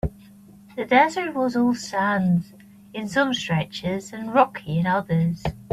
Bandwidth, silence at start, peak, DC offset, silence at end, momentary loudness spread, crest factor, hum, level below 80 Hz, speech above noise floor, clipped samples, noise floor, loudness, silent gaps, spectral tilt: 14 kHz; 0.05 s; -4 dBFS; under 0.1%; 0.05 s; 13 LU; 20 dB; none; -46 dBFS; 26 dB; under 0.1%; -48 dBFS; -23 LUFS; none; -6 dB/octave